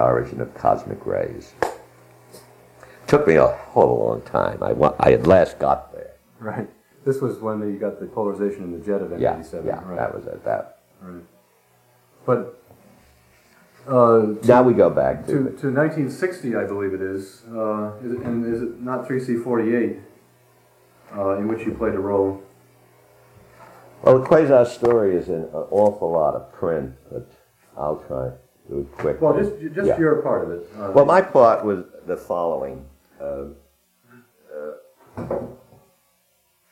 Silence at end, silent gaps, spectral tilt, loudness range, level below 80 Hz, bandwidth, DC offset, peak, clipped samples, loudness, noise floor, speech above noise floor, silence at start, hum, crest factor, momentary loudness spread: 1.15 s; none; -8 dB/octave; 11 LU; -50 dBFS; 16 kHz; under 0.1%; -2 dBFS; under 0.1%; -21 LUFS; -64 dBFS; 44 dB; 0 s; none; 20 dB; 19 LU